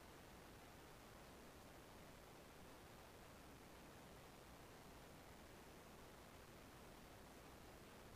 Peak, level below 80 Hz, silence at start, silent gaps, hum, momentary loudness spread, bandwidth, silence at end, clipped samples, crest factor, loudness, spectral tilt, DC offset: -48 dBFS; -70 dBFS; 0 s; none; none; 0 LU; 15.5 kHz; 0 s; under 0.1%; 14 dB; -62 LUFS; -4 dB/octave; under 0.1%